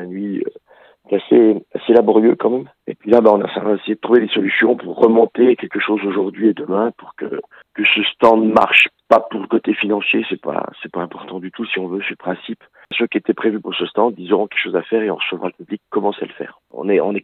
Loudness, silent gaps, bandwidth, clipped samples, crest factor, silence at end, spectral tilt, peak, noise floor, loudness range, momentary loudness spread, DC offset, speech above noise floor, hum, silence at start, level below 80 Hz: -16 LUFS; none; 8 kHz; under 0.1%; 16 dB; 0.05 s; -6.5 dB/octave; 0 dBFS; -49 dBFS; 7 LU; 15 LU; under 0.1%; 33 dB; none; 0 s; -64 dBFS